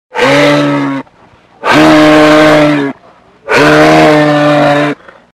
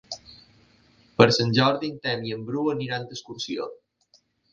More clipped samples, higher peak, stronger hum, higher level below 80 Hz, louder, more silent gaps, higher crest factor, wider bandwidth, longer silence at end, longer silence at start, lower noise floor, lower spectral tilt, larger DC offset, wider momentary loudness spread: first, 1% vs under 0.1%; about the same, 0 dBFS vs 0 dBFS; neither; first, -40 dBFS vs -62 dBFS; first, -6 LUFS vs -24 LUFS; neither; second, 8 dB vs 26 dB; first, 15 kHz vs 9.4 kHz; second, 0.4 s vs 0.8 s; about the same, 0.15 s vs 0.1 s; second, -42 dBFS vs -64 dBFS; about the same, -5.5 dB/octave vs -5.5 dB/octave; neither; second, 12 LU vs 19 LU